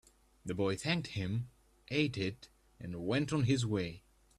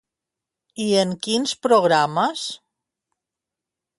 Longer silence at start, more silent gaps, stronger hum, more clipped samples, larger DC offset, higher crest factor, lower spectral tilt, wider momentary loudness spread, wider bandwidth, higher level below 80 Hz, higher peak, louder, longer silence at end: second, 0.45 s vs 0.75 s; neither; neither; neither; neither; about the same, 18 dB vs 18 dB; first, -6 dB/octave vs -4 dB/octave; first, 17 LU vs 14 LU; about the same, 12.5 kHz vs 11.5 kHz; first, -62 dBFS vs -70 dBFS; second, -18 dBFS vs -4 dBFS; second, -36 LUFS vs -20 LUFS; second, 0.4 s vs 1.4 s